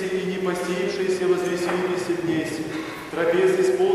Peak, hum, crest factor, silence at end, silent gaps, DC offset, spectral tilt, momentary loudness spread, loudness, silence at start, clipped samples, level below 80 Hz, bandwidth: -10 dBFS; none; 14 dB; 0 s; none; under 0.1%; -5.5 dB/octave; 9 LU; -23 LUFS; 0 s; under 0.1%; -60 dBFS; 13.5 kHz